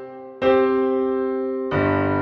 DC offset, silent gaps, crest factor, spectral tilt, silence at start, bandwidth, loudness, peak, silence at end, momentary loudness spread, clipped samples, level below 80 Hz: under 0.1%; none; 14 dB; -9 dB/octave; 0 s; 5.6 kHz; -21 LUFS; -6 dBFS; 0 s; 6 LU; under 0.1%; -52 dBFS